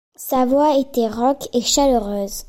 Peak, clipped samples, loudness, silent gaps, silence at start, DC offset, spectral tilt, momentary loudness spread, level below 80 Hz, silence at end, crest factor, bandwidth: -4 dBFS; under 0.1%; -18 LUFS; none; 0.2 s; under 0.1%; -3.5 dB/octave; 6 LU; -40 dBFS; 0.05 s; 14 dB; 16.5 kHz